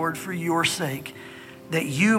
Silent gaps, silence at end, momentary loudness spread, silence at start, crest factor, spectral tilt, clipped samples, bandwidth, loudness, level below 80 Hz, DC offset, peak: none; 0 s; 18 LU; 0 s; 16 dB; -4.5 dB/octave; under 0.1%; 17 kHz; -25 LUFS; -66 dBFS; under 0.1%; -8 dBFS